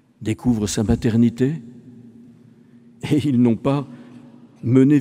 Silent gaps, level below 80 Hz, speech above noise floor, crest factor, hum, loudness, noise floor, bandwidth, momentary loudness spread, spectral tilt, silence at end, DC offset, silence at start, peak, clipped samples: none; -44 dBFS; 31 dB; 18 dB; none; -19 LUFS; -48 dBFS; 15.5 kHz; 15 LU; -7 dB/octave; 0 s; under 0.1%; 0.2 s; -2 dBFS; under 0.1%